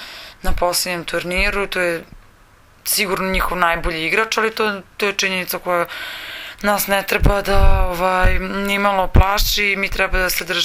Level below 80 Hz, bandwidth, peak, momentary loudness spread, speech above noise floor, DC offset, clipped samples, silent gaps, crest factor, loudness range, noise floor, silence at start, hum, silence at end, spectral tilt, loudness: -24 dBFS; 17 kHz; 0 dBFS; 7 LU; 32 dB; under 0.1%; under 0.1%; none; 18 dB; 3 LU; -49 dBFS; 0 s; none; 0 s; -3.5 dB/octave; -18 LUFS